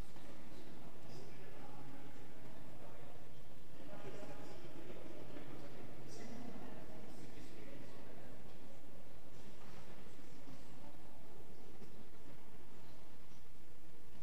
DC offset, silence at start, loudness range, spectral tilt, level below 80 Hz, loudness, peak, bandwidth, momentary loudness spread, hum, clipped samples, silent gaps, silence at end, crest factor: 2%; 0 s; 6 LU; -6 dB/octave; -68 dBFS; -57 LUFS; -30 dBFS; 15.5 kHz; 8 LU; none; under 0.1%; none; 0 s; 16 dB